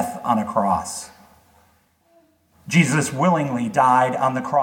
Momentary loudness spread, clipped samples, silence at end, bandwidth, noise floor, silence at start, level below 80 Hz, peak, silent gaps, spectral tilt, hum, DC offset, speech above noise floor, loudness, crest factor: 8 LU; under 0.1%; 0 s; 17 kHz; -60 dBFS; 0 s; -58 dBFS; -2 dBFS; none; -5.5 dB/octave; none; under 0.1%; 41 dB; -20 LUFS; 18 dB